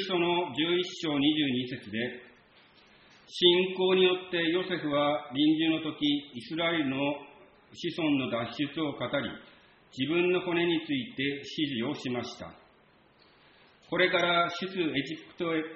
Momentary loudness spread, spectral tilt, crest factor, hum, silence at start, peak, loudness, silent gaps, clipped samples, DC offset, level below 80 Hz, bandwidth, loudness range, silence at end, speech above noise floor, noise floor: 12 LU; -3 dB/octave; 22 dB; none; 0 s; -8 dBFS; -29 LUFS; none; under 0.1%; under 0.1%; -68 dBFS; 7.2 kHz; 6 LU; 0 s; 33 dB; -62 dBFS